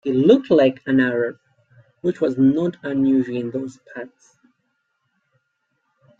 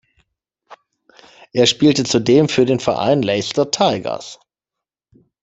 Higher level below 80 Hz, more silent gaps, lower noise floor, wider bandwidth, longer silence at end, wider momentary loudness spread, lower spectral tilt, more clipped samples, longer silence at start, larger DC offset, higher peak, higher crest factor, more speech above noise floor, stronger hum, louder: second, -64 dBFS vs -56 dBFS; neither; second, -72 dBFS vs -85 dBFS; second, 7.4 kHz vs 8.4 kHz; first, 2.15 s vs 1.1 s; first, 19 LU vs 12 LU; first, -8 dB/octave vs -4.5 dB/octave; neither; second, 0.05 s vs 0.7 s; neither; about the same, -2 dBFS vs -2 dBFS; about the same, 18 dB vs 16 dB; second, 53 dB vs 69 dB; neither; second, -19 LUFS vs -16 LUFS